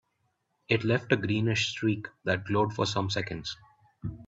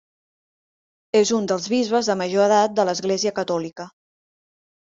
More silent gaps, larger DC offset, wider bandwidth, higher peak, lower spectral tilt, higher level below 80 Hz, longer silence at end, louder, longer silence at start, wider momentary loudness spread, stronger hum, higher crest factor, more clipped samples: neither; neither; about the same, 8 kHz vs 7.8 kHz; second, -10 dBFS vs -6 dBFS; first, -5.5 dB/octave vs -4 dB/octave; first, -58 dBFS vs -68 dBFS; second, 0 s vs 1 s; second, -29 LUFS vs -20 LUFS; second, 0.7 s vs 1.15 s; first, 12 LU vs 9 LU; neither; about the same, 20 dB vs 18 dB; neither